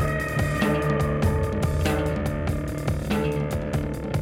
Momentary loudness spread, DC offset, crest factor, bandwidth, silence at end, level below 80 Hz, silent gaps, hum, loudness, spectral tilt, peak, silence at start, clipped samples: 5 LU; under 0.1%; 16 dB; 17 kHz; 0 s; -32 dBFS; none; none; -25 LUFS; -6.5 dB/octave; -8 dBFS; 0 s; under 0.1%